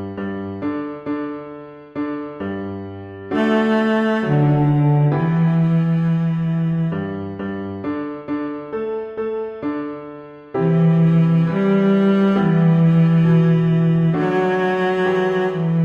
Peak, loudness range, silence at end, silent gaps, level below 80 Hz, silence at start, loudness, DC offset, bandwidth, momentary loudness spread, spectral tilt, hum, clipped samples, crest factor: -6 dBFS; 10 LU; 0 s; none; -52 dBFS; 0 s; -18 LUFS; under 0.1%; 4.9 kHz; 13 LU; -9.5 dB/octave; none; under 0.1%; 12 dB